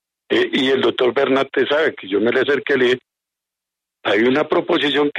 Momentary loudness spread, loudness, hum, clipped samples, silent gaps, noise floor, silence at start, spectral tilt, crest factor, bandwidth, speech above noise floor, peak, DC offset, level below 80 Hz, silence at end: 4 LU; -18 LUFS; none; under 0.1%; none; -84 dBFS; 0.3 s; -5 dB/octave; 14 dB; 9.2 kHz; 67 dB; -4 dBFS; under 0.1%; -64 dBFS; 0 s